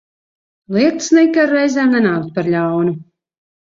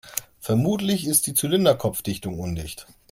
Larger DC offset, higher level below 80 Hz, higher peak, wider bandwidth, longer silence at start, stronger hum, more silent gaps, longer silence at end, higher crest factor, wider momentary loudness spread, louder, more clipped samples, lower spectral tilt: neither; second, -60 dBFS vs -50 dBFS; about the same, -2 dBFS vs -4 dBFS; second, 7.8 kHz vs 16.5 kHz; first, 0.7 s vs 0.05 s; neither; neither; first, 0.65 s vs 0.3 s; second, 14 dB vs 20 dB; second, 8 LU vs 13 LU; first, -15 LUFS vs -23 LUFS; neither; about the same, -5.5 dB/octave vs -4.5 dB/octave